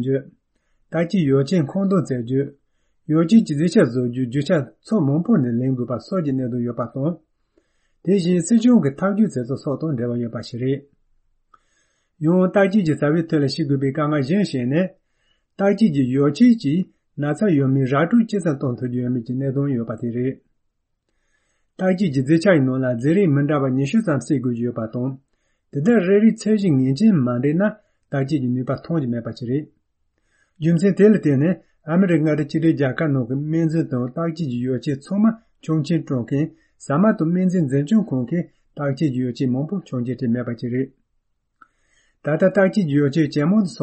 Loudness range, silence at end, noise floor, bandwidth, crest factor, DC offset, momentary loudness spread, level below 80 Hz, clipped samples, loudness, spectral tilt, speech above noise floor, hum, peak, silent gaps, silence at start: 5 LU; 0 s; -72 dBFS; 8.8 kHz; 16 dB; under 0.1%; 10 LU; -60 dBFS; under 0.1%; -20 LUFS; -8 dB/octave; 53 dB; none; -4 dBFS; none; 0 s